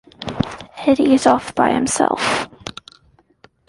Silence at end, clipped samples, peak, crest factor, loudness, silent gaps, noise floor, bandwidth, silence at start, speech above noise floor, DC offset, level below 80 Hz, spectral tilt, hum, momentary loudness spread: 1 s; under 0.1%; -2 dBFS; 18 dB; -17 LUFS; none; -55 dBFS; 11.5 kHz; 0.2 s; 39 dB; under 0.1%; -48 dBFS; -4 dB/octave; none; 17 LU